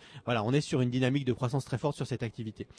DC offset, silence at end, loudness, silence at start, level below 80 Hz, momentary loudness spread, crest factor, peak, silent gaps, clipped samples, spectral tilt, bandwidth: under 0.1%; 0.15 s; -31 LUFS; 0 s; -62 dBFS; 7 LU; 16 dB; -16 dBFS; none; under 0.1%; -6.5 dB/octave; 11 kHz